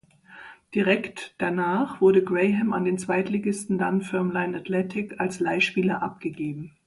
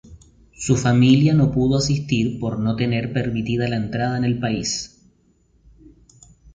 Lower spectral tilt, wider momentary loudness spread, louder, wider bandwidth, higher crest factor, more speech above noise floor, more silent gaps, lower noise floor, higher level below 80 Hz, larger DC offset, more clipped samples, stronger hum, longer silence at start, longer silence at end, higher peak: about the same, -6 dB/octave vs -6 dB/octave; about the same, 10 LU vs 9 LU; second, -25 LUFS vs -20 LUFS; first, 11.5 kHz vs 9.4 kHz; about the same, 18 dB vs 18 dB; second, 23 dB vs 40 dB; neither; second, -48 dBFS vs -59 dBFS; second, -64 dBFS vs -44 dBFS; neither; neither; neither; first, 0.3 s vs 0.1 s; second, 0.2 s vs 1.65 s; second, -8 dBFS vs -4 dBFS